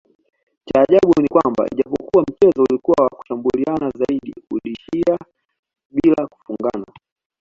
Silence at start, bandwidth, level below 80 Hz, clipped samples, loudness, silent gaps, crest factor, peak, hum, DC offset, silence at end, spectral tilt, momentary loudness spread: 0.65 s; 7.4 kHz; -52 dBFS; under 0.1%; -18 LUFS; 5.59-5.63 s, 5.85-5.90 s; 16 dB; -2 dBFS; none; under 0.1%; 0.55 s; -8 dB/octave; 12 LU